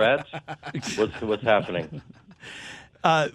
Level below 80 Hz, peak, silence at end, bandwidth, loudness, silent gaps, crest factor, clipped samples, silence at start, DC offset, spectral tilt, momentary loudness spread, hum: -58 dBFS; -6 dBFS; 0.05 s; 12.5 kHz; -26 LUFS; none; 20 dB; under 0.1%; 0 s; under 0.1%; -4.5 dB/octave; 19 LU; none